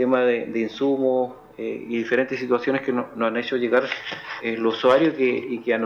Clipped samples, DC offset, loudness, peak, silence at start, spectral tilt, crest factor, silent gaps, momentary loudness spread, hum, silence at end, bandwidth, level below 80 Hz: under 0.1%; under 0.1%; -23 LUFS; -8 dBFS; 0 s; -6 dB/octave; 16 dB; none; 11 LU; none; 0 s; 7 kHz; -66 dBFS